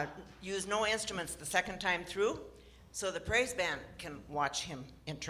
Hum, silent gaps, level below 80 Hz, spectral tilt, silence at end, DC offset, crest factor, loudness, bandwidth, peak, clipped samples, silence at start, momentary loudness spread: none; none; -58 dBFS; -2.5 dB/octave; 0 s; under 0.1%; 22 dB; -35 LUFS; 16 kHz; -16 dBFS; under 0.1%; 0 s; 14 LU